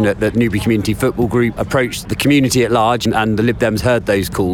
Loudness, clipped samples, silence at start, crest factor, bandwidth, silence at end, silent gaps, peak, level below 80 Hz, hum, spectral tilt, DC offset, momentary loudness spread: -15 LUFS; under 0.1%; 0 s; 14 dB; 18 kHz; 0 s; none; 0 dBFS; -36 dBFS; none; -5.5 dB/octave; under 0.1%; 4 LU